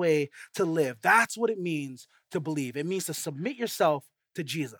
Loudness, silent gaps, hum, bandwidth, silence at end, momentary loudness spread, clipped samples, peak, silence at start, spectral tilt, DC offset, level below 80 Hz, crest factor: -28 LUFS; none; none; 19 kHz; 0.05 s; 14 LU; under 0.1%; -8 dBFS; 0 s; -4.5 dB/octave; under 0.1%; -82 dBFS; 20 dB